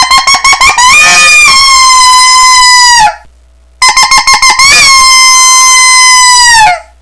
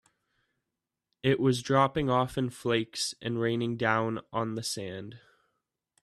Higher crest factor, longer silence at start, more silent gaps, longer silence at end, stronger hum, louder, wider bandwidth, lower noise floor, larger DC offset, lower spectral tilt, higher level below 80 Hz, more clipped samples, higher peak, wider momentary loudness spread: second, 2 dB vs 22 dB; second, 0 s vs 1.25 s; neither; second, 0.2 s vs 0.85 s; neither; first, 0 LUFS vs -29 LUFS; second, 11 kHz vs 14 kHz; second, -39 dBFS vs -87 dBFS; neither; second, 2.5 dB/octave vs -5 dB/octave; first, -30 dBFS vs -60 dBFS; first, 20% vs under 0.1%; first, 0 dBFS vs -10 dBFS; second, 4 LU vs 9 LU